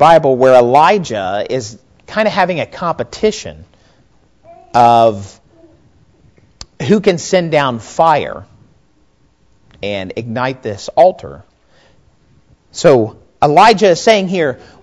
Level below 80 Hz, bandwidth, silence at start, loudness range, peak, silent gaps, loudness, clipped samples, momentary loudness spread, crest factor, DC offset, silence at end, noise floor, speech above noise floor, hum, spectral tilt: -48 dBFS; 11 kHz; 0 s; 6 LU; 0 dBFS; none; -12 LUFS; 0.8%; 16 LU; 14 dB; 0.2%; 0.3 s; -55 dBFS; 43 dB; none; -5 dB/octave